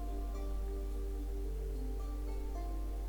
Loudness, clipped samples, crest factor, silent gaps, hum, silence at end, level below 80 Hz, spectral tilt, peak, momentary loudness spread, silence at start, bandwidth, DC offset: -42 LUFS; under 0.1%; 8 dB; none; none; 0 s; -38 dBFS; -7 dB/octave; -30 dBFS; 1 LU; 0 s; 19.5 kHz; under 0.1%